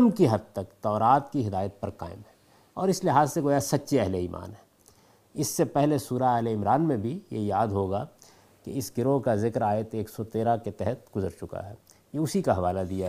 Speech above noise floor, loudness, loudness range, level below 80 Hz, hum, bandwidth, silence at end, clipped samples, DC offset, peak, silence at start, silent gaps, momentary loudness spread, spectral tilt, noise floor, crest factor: 33 dB; -27 LUFS; 2 LU; -62 dBFS; none; 15.5 kHz; 0 s; under 0.1%; under 0.1%; -8 dBFS; 0 s; none; 15 LU; -6.5 dB/octave; -59 dBFS; 20 dB